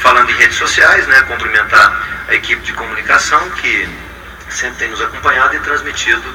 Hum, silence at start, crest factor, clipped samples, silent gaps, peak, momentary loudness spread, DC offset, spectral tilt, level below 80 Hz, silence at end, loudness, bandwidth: none; 0 s; 12 dB; 0.5%; none; 0 dBFS; 12 LU; under 0.1%; -1.5 dB/octave; -36 dBFS; 0 s; -11 LUFS; over 20 kHz